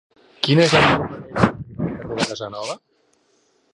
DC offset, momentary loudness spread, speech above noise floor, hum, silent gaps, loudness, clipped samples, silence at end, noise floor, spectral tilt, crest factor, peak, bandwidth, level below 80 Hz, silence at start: under 0.1%; 15 LU; 44 dB; none; none; -20 LUFS; under 0.1%; 0.95 s; -62 dBFS; -5 dB/octave; 20 dB; 0 dBFS; 11.5 kHz; -46 dBFS; 0.4 s